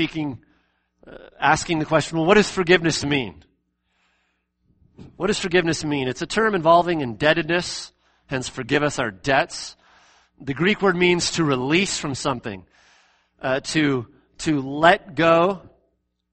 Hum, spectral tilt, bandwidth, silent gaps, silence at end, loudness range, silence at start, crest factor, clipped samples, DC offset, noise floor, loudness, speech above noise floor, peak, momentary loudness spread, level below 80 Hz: none; -4.5 dB/octave; 8.8 kHz; none; 0.65 s; 4 LU; 0 s; 22 dB; under 0.1%; under 0.1%; -70 dBFS; -21 LUFS; 49 dB; 0 dBFS; 14 LU; -50 dBFS